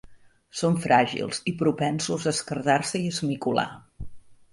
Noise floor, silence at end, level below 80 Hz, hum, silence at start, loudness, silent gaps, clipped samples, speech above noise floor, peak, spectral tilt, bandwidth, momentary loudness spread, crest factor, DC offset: -50 dBFS; 0.2 s; -54 dBFS; none; 0.1 s; -25 LUFS; none; under 0.1%; 25 dB; -6 dBFS; -4.5 dB/octave; 11.5 kHz; 18 LU; 20 dB; under 0.1%